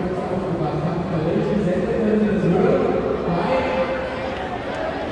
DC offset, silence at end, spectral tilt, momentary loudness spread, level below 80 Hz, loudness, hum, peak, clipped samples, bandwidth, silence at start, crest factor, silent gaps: under 0.1%; 0 s; -8 dB/octave; 8 LU; -42 dBFS; -21 LUFS; none; -6 dBFS; under 0.1%; 10 kHz; 0 s; 14 dB; none